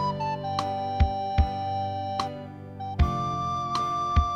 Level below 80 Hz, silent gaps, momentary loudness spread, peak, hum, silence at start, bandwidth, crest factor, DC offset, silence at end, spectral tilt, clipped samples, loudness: -32 dBFS; none; 9 LU; -8 dBFS; none; 0 s; 9 kHz; 18 dB; under 0.1%; 0 s; -6.5 dB/octave; under 0.1%; -28 LUFS